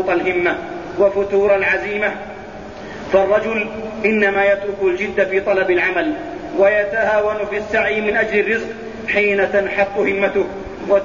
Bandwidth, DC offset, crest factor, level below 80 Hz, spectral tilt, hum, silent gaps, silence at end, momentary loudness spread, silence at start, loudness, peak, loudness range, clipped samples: 7.4 kHz; 0.3%; 16 dB; -46 dBFS; -6 dB/octave; none; none; 0 s; 12 LU; 0 s; -17 LUFS; -2 dBFS; 2 LU; under 0.1%